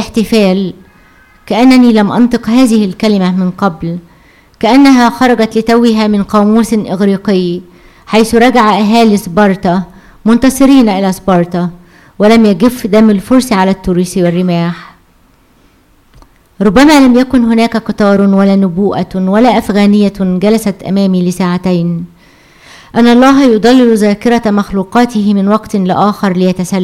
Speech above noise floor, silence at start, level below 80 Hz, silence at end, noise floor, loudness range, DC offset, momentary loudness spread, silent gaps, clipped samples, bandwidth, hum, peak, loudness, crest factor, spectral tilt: 39 dB; 0 s; -38 dBFS; 0 s; -46 dBFS; 3 LU; under 0.1%; 8 LU; none; under 0.1%; 15.5 kHz; none; 0 dBFS; -9 LUFS; 8 dB; -6 dB/octave